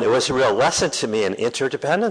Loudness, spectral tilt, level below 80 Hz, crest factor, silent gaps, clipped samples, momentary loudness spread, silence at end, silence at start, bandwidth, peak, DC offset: -20 LUFS; -3.5 dB/octave; -52 dBFS; 12 dB; none; under 0.1%; 5 LU; 0 s; 0 s; 11 kHz; -8 dBFS; under 0.1%